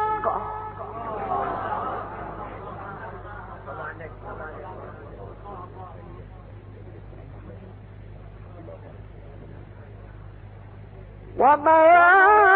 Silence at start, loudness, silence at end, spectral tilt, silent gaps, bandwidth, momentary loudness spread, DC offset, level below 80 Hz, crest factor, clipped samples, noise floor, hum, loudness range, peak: 0 s; -20 LUFS; 0 s; -10 dB/octave; none; 4.3 kHz; 28 LU; under 0.1%; -46 dBFS; 18 dB; under 0.1%; -42 dBFS; none; 21 LU; -6 dBFS